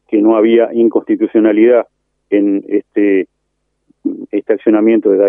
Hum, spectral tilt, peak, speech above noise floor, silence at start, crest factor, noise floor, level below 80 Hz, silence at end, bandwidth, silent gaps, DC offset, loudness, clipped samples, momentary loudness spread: none; -10 dB/octave; 0 dBFS; 57 dB; 0.1 s; 12 dB; -68 dBFS; -70 dBFS; 0 s; 3.5 kHz; none; under 0.1%; -12 LUFS; under 0.1%; 12 LU